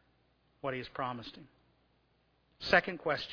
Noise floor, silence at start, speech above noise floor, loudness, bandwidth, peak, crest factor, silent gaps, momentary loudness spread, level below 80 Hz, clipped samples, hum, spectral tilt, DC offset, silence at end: -73 dBFS; 0.65 s; 38 dB; -33 LUFS; 5.4 kHz; -10 dBFS; 26 dB; none; 15 LU; -64 dBFS; under 0.1%; none; -2 dB/octave; under 0.1%; 0 s